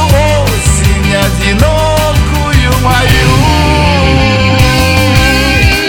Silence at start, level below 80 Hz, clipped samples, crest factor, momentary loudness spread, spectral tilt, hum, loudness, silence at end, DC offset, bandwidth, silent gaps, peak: 0 s; -14 dBFS; 2%; 8 dB; 2 LU; -5 dB/octave; none; -8 LUFS; 0 s; under 0.1%; 19.5 kHz; none; 0 dBFS